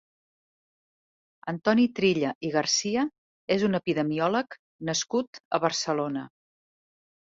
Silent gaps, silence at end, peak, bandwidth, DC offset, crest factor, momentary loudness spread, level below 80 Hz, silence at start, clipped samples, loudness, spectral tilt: 2.35-2.41 s, 3.18-3.48 s, 4.59-4.79 s, 5.27-5.33 s, 5.40-5.51 s; 1 s; -8 dBFS; 8 kHz; under 0.1%; 20 dB; 13 LU; -68 dBFS; 1.45 s; under 0.1%; -27 LUFS; -4 dB/octave